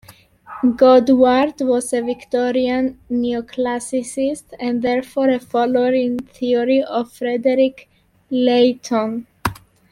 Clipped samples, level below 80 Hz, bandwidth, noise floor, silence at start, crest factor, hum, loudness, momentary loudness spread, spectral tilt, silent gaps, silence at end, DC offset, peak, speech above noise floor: under 0.1%; -52 dBFS; 13.5 kHz; -42 dBFS; 0.1 s; 16 dB; none; -18 LUFS; 10 LU; -5 dB/octave; none; 0.35 s; under 0.1%; -2 dBFS; 25 dB